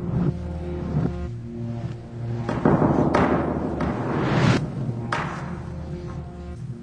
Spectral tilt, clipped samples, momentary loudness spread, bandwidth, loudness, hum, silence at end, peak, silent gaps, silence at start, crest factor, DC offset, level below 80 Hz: -7.5 dB/octave; under 0.1%; 14 LU; 9.8 kHz; -25 LUFS; none; 0 s; -4 dBFS; none; 0 s; 20 dB; under 0.1%; -38 dBFS